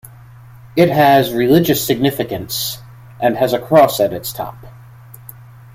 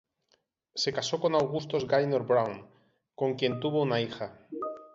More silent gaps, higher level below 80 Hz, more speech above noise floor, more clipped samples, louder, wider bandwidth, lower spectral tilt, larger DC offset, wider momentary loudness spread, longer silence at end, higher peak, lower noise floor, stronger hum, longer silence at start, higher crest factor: neither; first, -48 dBFS vs -68 dBFS; second, 25 dB vs 44 dB; neither; first, -15 LUFS vs -30 LUFS; first, 16.5 kHz vs 8 kHz; about the same, -5 dB/octave vs -5 dB/octave; neither; about the same, 14 LU vs 12 LU; first, 1 s vs 0.1 s; first, -2 dBFS vs -12 dBFS; second, -39 dBFS vs -73 dBFS; neither; second, 0.05 s vs 0.75 s; about the same, 16 dB vs 18 dB